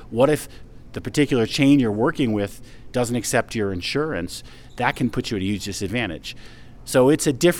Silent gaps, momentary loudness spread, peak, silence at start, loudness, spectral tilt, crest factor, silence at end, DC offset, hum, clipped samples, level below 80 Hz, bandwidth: none; 17 LU; -2 dBFS; 0 s; -22 LUFS; -5 dB/octave; 18 dB; 0 s; under 0.1%; none; under 0.1%; -44 dBFS; 17.5 kHz